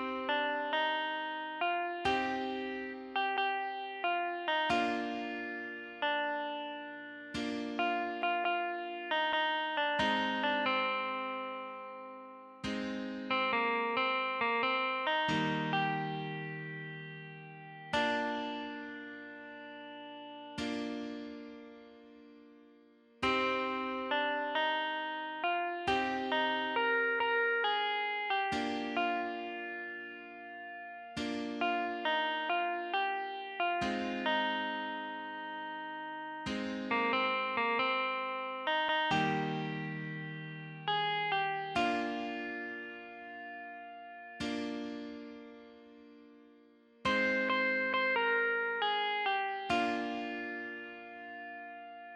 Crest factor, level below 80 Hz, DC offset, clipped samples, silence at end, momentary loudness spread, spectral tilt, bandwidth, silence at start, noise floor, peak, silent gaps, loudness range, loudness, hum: 18 dB; -68 dBFS; under 0.1%; under 0.1%; 0 s; 15 LU; -4.5 dB/octave; 11 kHz; 0 s; -62 dBFS; -18 dBFS; none; 7 LU; -34 LUFS; none